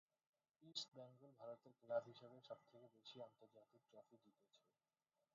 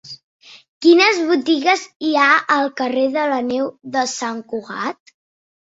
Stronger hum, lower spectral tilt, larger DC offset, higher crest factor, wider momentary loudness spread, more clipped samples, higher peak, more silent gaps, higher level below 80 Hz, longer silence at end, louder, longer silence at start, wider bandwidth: neither; about the same, -2.5 dB/octave vs -2.5 dB/octave; neither; first, 26 dB vs 18 dB; about the same, 16 LU vs 14 LU; neither; second, -32 dBFS vs -2 dBFS; second, none vs 0.24-0.40 s, 0.68-0.81 s, 1.96-2.00 s; second, under -90 dBFS vs -68 dBFS; about the same, 0.8 s vs 0.75 s; second, -55 LUFS vs -17 LUFS; first, 0.6 s vs 0.05 s; second, 7 kHz vs 8 kHz